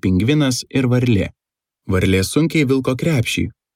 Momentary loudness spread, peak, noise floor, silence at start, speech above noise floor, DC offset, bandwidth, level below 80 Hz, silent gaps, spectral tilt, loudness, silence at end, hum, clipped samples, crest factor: 5 LU; -4 dBFS; -56 dBFS; 0.05 s; 39 dB; under 0.1%; 16 kHz; -44 dBFS; none; -6 dB/octave; -17 LUFS; 0.25 s; none; under 0.1%; 14 dB